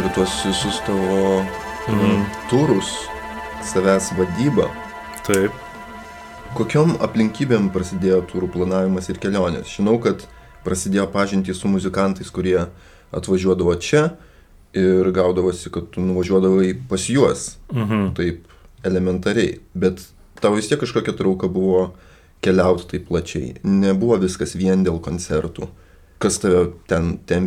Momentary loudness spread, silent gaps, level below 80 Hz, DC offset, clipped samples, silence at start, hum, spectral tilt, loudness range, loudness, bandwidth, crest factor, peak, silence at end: 11 LU; none; -44 dBFS; under 0.1%; under 0.1%; 0 s; none; -6 dB/octave; 2 LU; -20 LUFS; 14.5 kHz; 18 dB; -2 dBFS; 0 s